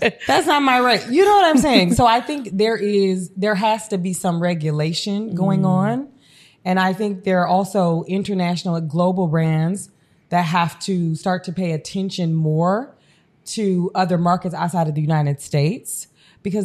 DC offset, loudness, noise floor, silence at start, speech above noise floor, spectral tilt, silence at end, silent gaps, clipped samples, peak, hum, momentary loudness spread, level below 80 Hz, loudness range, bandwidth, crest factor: under 0.1%; -19 LUFS; -56 dBFS; 0 s; 38 dB; -5.5 dB/octave; 0 s; none; under 0.1%; 0 dBFS; none; 10 LU; -50 dBFS; 5 LU; 14 kHz; 18 dB